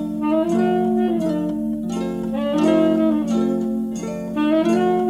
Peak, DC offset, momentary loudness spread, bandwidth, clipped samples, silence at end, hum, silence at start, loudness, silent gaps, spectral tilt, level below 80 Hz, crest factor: -4 dBFS; under 0.1%; 8 LU; 13 kHz; under 0.1%; 0 s; 50 Hz at -45 dBFS; 0 s; -20 LUFS; none; -7 dB/octave; -50 dBFS; 14 dB